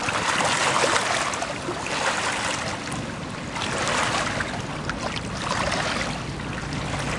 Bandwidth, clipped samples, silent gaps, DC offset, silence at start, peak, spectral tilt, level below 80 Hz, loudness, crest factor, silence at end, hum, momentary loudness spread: 11.5 kHz; under 0.1%; none; under 0.1%; 0 s; -4 dBFS; -3 dB/octave; -44 dBFS; -25 LUFS; 22 dB; 0 s; none; 10 LU